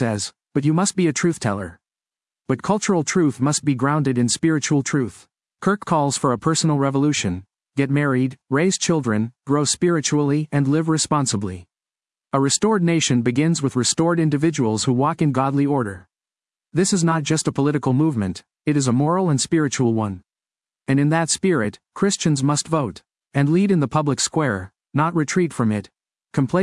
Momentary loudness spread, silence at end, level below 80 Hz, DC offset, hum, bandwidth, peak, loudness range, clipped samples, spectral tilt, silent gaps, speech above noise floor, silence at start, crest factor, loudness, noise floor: 8 LU; 0 s; -60 dBFS; under 0.1%; none; 12 kHz; -4 dBFS; 2 LU; under 0.1%; -5 dB/octave; none; over 71 dB; 0 s; 16 dB; -20 LUFS; under -90 dBFS